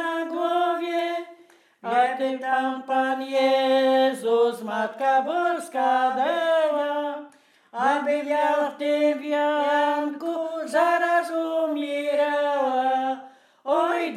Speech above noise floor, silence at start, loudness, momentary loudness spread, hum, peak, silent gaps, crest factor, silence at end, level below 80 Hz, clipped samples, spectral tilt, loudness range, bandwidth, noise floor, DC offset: 32 dB; 0 s; -23 LUFS; 8 LU; none; -8 dBFS; none; 14 dB; 0 s; under -90 dBFS; under 0.1%; -3.5 dB/octave; 2 LU; 14.5 kHz; -54 dBFS; under 0.1%